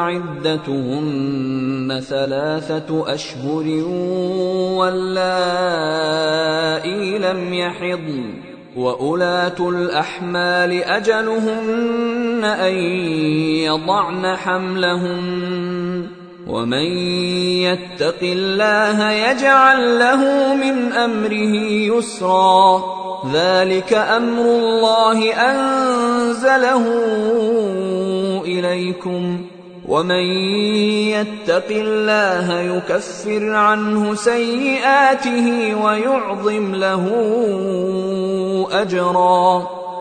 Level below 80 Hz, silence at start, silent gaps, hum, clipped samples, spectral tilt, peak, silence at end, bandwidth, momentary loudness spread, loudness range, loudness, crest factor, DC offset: -58 dBFS; 0 s; none; none; under 0.1%; -5 dB/octave; 0 dBFS; 0 s; 9.4 kHz; 9 LU; 6 LU; -17 LUFS; 16 dB; under 0.1%